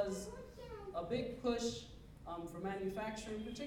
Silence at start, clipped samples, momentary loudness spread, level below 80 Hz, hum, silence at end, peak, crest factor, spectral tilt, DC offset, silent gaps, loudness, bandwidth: 0 s; under 0.1%; 12 LU; -60 dBFS; none; 0 s; -24 dBFS; 18 dB; -5 dB/octave; under 0.1%; none; -43 LUFS; 18 kHz